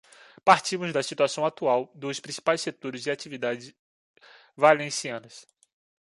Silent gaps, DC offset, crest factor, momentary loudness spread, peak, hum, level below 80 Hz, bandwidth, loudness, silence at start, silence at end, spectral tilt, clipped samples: 3.79-4.14 s; under 0.1%; 24 dB; 13 LU; -4 dBFS; none; -76 dBFS; 11.5 kHz; -26 LUFS; 0.45 s; 0.65 s; -3.5 dB/octave; under 0.1%